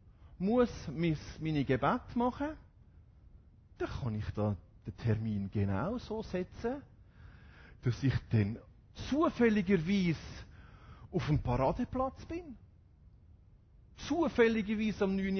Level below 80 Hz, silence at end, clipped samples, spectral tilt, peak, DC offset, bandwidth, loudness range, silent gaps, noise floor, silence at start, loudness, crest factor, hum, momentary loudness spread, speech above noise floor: -52 dBFS; 0 s; under 0.1%; -7.5 dB/octave; -14 dBFS; under 0.1%; 6.6 kHz; 5 LU; none; -60 dBFS; 0.2 s; -34 LUFS; 20 dB; none; 15 LU; 28 dB